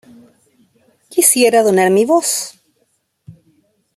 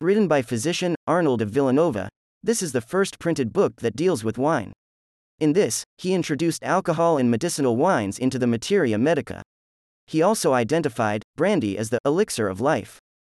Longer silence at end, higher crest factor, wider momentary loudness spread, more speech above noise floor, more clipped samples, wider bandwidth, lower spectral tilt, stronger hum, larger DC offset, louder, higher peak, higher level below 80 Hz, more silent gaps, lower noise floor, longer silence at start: first, 0.65 s vs 0.4 s; about the same, 16 dB vs 14 dB; first, 11 LU vs 6 LU; second, 52 dB vs over 68 dB; neither; first, 16 kHz vs 13.5 kHz; second, -3 dB/octave vs -5.5 dB/octave; neither; neither; first, -13 LUFS vs -23 LUFS; first, 0 dBFS vs -8 dBFS; second, -66 dBFS vs -60 dBFS; second, none vs 0.96-1.07 s, 2.16-2.41 s, 4.76-5.38 s, 5.86-5.97 s, 9.45-10.07 s, 11.24-11.34 s, 12.00-12.04 s; second, -64 dBFS vs under -90 dBFS; first, 1.15 s vs 0 s